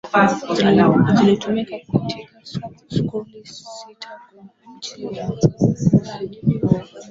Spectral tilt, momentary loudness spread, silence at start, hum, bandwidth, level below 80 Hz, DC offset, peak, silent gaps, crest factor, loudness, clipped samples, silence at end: -7 dB/octave; 21 LU; 0.05 s; none; 7.8 kHz; -48 dBFS; under 0.1%; -2 dBFS; none; 18 dB; -18 LUFS; under 0.1%; 0 s